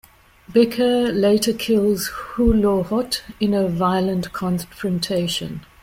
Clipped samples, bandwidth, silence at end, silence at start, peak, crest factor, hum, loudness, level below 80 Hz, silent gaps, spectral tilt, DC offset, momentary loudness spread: under 0.1%; 16.5 kHz; 0.2 s; 0.5 s; -4 dBFS; 16 dB; none; -20 LUFS; -38 dBFS; none; -5.5 dB/octave; under 0.1%; 8 LU